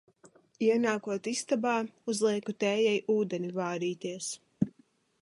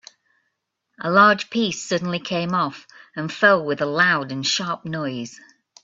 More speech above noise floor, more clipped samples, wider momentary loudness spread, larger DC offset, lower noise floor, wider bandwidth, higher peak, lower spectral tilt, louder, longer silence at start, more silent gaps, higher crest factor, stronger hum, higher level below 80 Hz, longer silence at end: second, 36 dB vs 55 dB; neither; second, 8 LU vs 15 LU; neither; second, -66 dBFS vs -76 dBFS; first, 11.5 kHz vs 7.8 kHz; second, -12 dBFS vs -2 dBFS; about the same, -4.5 dB/octave vs -4 dB/octave; second, -31 LUFS vs -20 LUFS; second, 0.6 s vs 1 s; neither; about the same, 18 dB vs 20 dB; neither; second, -74 dBFS vs -66 dBFS; about the same, 0.5 s vs 0.5 s